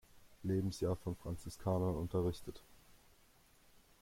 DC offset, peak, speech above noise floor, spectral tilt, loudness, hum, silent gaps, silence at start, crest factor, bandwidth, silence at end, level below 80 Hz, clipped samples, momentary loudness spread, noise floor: under 0.1%; -24 dBFS; 29 dB; -7.5 dB/octave; -40 LUFS; none; none; 0.15 s; 16 dB; 16.5 kHz; 1.05 s; -60 dBFS; under 0.1%; 12 LU; -67 dBFS